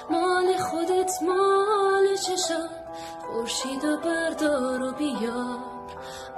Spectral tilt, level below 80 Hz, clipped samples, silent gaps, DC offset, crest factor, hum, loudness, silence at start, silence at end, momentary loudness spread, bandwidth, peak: -3 dB/octave; -60 dBFS; under 0.1%; none; under 0.1%; 14 dB; none; -25 LUFS; 0 s; 0 s; 15 LU; 14 kHz; -12 dBFS